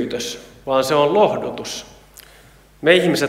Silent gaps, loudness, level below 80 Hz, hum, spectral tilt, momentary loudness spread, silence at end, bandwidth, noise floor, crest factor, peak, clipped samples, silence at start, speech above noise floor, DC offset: none; -18 LUFS; -52 dBFS; none; -4 dB/octave; 15 LU; 0 s; 16 kHz; -48 dBFS; 20 dB; 0 dBFS; under 0.1%; 0 s; 30 dB; under 0.1%